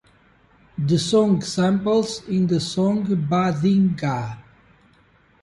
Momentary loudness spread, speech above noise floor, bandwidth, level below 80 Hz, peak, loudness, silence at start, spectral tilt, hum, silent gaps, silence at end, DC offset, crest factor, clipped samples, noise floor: 9 LU; 37 dB; 11.5 kHz; -54 dBFS; -8 dBFS; -21 LUFS; 0.8 s; -6.5 dB/octave; none; none; 1 s; under 0.1%; 14 dB; under 0.1%; -57 dBFS